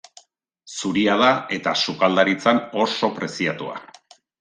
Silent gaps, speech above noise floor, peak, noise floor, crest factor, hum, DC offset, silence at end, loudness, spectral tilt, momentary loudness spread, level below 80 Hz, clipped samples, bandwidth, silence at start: none; 36 dB; -2 dBFS; -57 dBFS; 20 dB; none; under 0.1%; 0.6 s; -20 LUFS; -4 dB/octave; 13 LU; -64 dBFS; under 0.1%; 9.8 kHz; 0.65 s